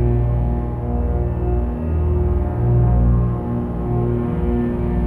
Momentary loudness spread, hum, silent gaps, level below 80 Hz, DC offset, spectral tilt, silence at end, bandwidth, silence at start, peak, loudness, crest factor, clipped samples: 6 LU; 60 Hz at -25 dBFS; none; -22 dBFS; under 0.1%; -12 dB/octave; 0 s; 3.2 kHz; 0 s; -6 dBFS; -20 LUFS; 12 dB; under 0.1%